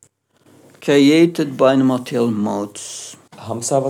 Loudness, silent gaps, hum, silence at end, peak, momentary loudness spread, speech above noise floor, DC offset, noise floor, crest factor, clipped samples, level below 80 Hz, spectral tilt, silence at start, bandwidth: -16 LUFS; none; none; 0 s; -2 dBFS; 17 LU; 39 dB; under 0.1%; -55 dBFS; 16 dB; under 0.1%; -78 dBFS; -5 dB/octave; 0.8 s; 15 kHz